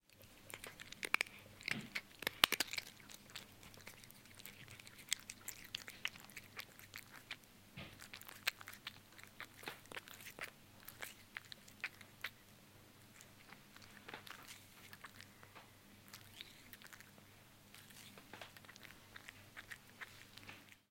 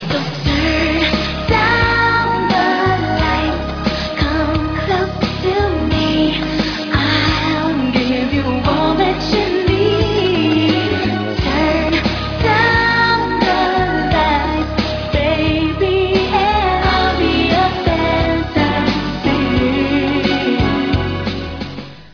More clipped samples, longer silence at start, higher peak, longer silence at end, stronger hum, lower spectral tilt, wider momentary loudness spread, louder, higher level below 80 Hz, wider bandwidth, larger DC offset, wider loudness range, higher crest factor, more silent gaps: neither; about the same, 0.1 s vs 0 s; second, -4 dBFS vs 0 dBFS; about the same, 0.1 s vs 0.05 s; neither; second, -1 dB/octave vs -6.5 dB/octave; first, 17 LU vs 5 LU; second, -46 LUFS vs -15 LUFS; second, -74 dBFS vs -28 dBFS; first, 17 kHz vs 5.4 kHz; neither; first, 16 LU vs 2 LU; first, 46 dB vs 14 dB; neither